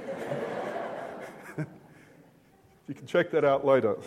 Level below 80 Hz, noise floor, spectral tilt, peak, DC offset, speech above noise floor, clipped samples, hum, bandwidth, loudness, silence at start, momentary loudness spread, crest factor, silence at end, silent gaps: -72 dBFS; -60 dBFS; -6.5 dB/octave; -10 dBFS; under 0.1%; 35 dB; under 0.1%; none; 13.5 kHz; -29 LUFS; 0 s; 17 LU; 20 dB; 0 s; none